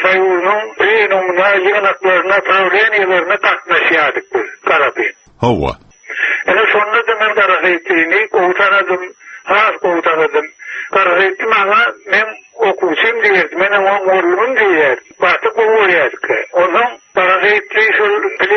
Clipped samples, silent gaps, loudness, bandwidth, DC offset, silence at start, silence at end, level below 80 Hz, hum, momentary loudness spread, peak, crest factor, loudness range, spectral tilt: under 0.1%; none; -12 LUFS; 6.6 kHz; under 0.1%; 0 s; 0 s; -46 dBFS; none; 7 LU; 0 dBFS; 12 dB; 2 LU; -1.5 dB/octave